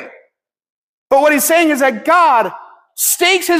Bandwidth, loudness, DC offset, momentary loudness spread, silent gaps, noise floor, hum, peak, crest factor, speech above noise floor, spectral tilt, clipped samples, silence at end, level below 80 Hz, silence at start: 16 kHz; -12 LUFS; under 0.1%; 6 LU; 0.70-1.06 s; -60 dBFS; none; -2 dBFS; 12 dB; 48 dB; -1 dB/octave; under 0.1%; 0 s; -64 dBFS; 0 s